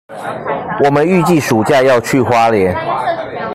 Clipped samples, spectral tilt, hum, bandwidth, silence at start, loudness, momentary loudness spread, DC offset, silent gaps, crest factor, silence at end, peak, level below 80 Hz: under 0.1%; -6 dB/octave; none; 16 kHz; 0.1 s; -13 LUFS; 10 LU; under 0.1%; none; 12 dB; 0 s; 0 dBFS; -46 dBFS